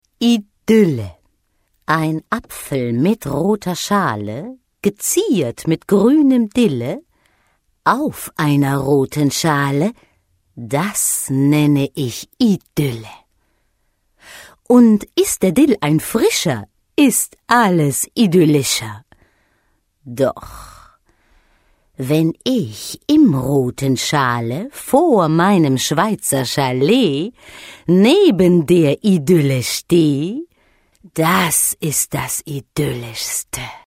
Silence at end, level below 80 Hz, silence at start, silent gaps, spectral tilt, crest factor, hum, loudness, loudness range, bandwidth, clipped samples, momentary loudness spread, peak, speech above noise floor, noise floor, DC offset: 0.1 s; -50 dBFS; 0.2 s; none; -5 dB/octave; 16 dB; none; -16 LUFS; 5 LU; 16 kHz; under 0.1%; 12 LU; 0 dBFS; 49 dB; -64 dBFS; under 0.1%